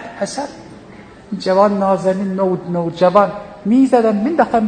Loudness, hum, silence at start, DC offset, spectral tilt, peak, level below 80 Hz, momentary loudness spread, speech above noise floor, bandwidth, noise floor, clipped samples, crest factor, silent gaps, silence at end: -16 LUFS; none; 0 s; under 0.1%; -7 dB/octave; 0 dBFS; -52 dBFS; 12 LU; 24 dB; 9.4 kHz; -38 dBFS; under 0.1%; 16 dB; none; 0 s